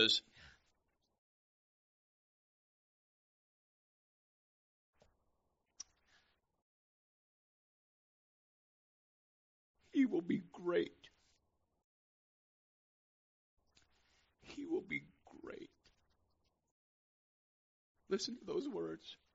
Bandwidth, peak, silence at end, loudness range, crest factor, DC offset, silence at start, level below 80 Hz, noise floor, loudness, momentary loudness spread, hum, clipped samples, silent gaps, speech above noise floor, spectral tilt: 7.6 kHz; -16 dBFS; 0.2 s; 22 LU; 30 dB; under 0.1%; 0 s; -82 dBFS; -83 dBFS; -40 LUFS; 19 LU; none; under 0.1%; 1.18-4.93 s, 6.62-9.74 s, 11.84-13.57 s, 16.71-17.95 s; 44 dB; -2 dB/octave